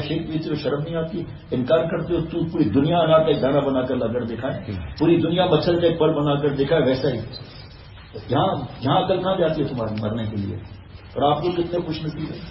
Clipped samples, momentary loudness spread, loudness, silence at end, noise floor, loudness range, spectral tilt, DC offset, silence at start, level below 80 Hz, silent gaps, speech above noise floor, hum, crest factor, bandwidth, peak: under 0.1%; 13 LU; -22 LUFS; 0 s; -41 dBFS; 4 LU; -10 dB/octave; under 0.1%; 0 s; -46 dBFS; none; 20 dB; none; 18 dB; 5.8 kHz; -4 dBFS